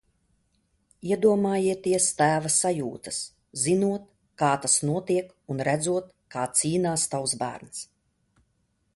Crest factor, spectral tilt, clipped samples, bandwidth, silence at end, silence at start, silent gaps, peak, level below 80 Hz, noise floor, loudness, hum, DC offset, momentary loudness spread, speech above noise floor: 18 dB; -4 dB/octave; under 0.1%; 12 kHz; 1.1 s; 1.05 s; none; -8 dBFS; -64 dBFS; -72 dBFS; -25 LUFS; none; under 0.1%; 14 LU; 47 dB